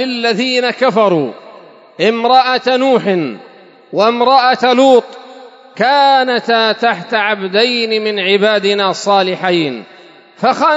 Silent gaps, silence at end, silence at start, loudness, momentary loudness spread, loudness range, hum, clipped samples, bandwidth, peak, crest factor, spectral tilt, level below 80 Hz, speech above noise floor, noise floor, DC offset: none; 0 s; 0 s; -12 LUFS; 7 LU; 2 LU; none; under 0.1%; 8 kHz; 0 dBFS; 12 dB; -4.5 dB/octave; -72 dBFS; 26 dB; -38 dBFS; under 0.1%